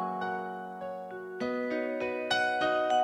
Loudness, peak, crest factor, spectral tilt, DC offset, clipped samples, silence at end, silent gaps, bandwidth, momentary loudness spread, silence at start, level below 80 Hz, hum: -32 LUFS; -14 dBFS; 16 dB; -4 dB/octave; under 0.1%; under 0.1%; 0 s; none; 12.5 kHz; 12 LU; 0 s; -70 dBFS; none